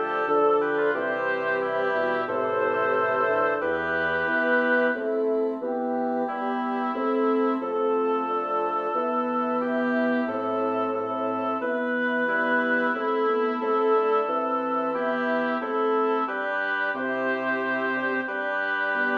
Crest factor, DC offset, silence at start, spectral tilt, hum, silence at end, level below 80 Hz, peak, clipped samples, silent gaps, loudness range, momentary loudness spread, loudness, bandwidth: 14 dB; under 0.1%; 0 s; -6.5 dB/octave; none; 0 s; -68 dBFS; -12 dBFS; under 0.1%; none; 2 LU; 4 LU; -25 LUFS; 6.2 kHz